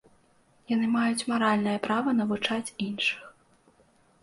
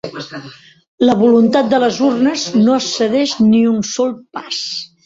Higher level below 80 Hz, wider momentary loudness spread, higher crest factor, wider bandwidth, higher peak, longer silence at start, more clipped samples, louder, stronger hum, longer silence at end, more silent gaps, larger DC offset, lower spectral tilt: second, -70 dBFS vs -56 dBFS; second, 6 LU vs 15 LU; about the same, 16 dB vs 14 dB; first, 11.5 kHz vs 7.8 kHz; second, -12 dBFS vs -2 dBFS; first, 0.7 s vs 0.05 s; neither; second, -27 LUFS vs -14 LUFS; neither; first, 0.95 s vs 0.2 s; second, none vs 0.88-0.98 s; neither; about the same, -4.5 dB/octave vs -4.5 dB/octave